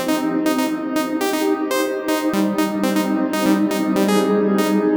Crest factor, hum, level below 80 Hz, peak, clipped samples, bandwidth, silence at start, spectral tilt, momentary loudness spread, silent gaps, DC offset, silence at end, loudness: 14 dB; none; -60 dBFS; -4 dBFS; under 0.1%; over 20 kHz; 0 s; -5 dB/octave; 4 LU; none; under 0.1%; 0 s; -19 LUFS